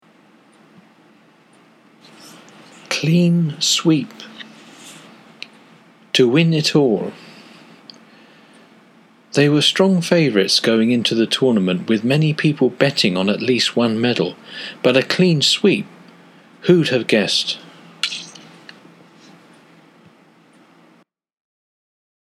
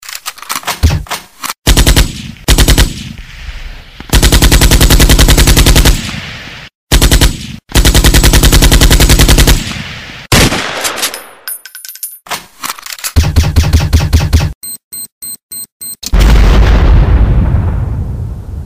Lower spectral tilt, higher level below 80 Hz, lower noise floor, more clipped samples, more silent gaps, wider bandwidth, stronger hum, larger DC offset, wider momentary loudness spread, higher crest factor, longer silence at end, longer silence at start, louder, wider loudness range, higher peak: about the same, -5 dB/octave vs -4 dB/octave; second, -70 dBFS vs -10 dBFS; first, -55 dBFS vs -28 dBFS; second, under 0.1% vs 0.6%; second, none vs 1.58-1.62 s, 6.75-6.87 s, 14.55-14.61 s, 14.84-14.91 s, 15.12-15.21 s, 15.43-15.49 s, 15.72-15.80 s; second, 14.5 kHz vs 16.5 kHz; neither; second, under 0.1% vs 0.5%; first, 20 LU vs 17 LU; first, 20 dB vs 8 dB; first, 3.95 s vs 0 s; first, 2.25 s vs 0.05 s; second, -16 LUFS vs -9 LUFS; about the same, 7 LU vs 6 LU; about the same, 0 dBFS vs 0 dBFS